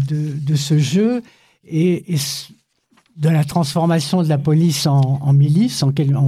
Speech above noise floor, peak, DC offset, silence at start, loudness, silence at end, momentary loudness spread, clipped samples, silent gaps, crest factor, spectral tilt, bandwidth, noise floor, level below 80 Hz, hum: 43 dB; -6 dBFS; under 0.1%; 0 s; -17 LUFS; 0 s; 6 LU; under 0.1%; none; 12 dB; -6.5 dB/octave; 15 kHz; -59 dBFS; -58 dBFS; none